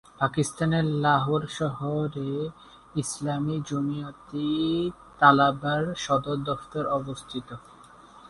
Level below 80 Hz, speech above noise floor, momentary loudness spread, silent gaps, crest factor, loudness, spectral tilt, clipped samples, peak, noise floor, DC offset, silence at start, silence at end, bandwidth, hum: -56 dBFS; 24 dB; 14 LU; none; 24 dB; -26 LUFS; -5.5 dB/octave; under 0.1%; -4 dBFS; -50 dBFS; under 0.1%; 0.2 s; 0 s; 11.5 kHz; none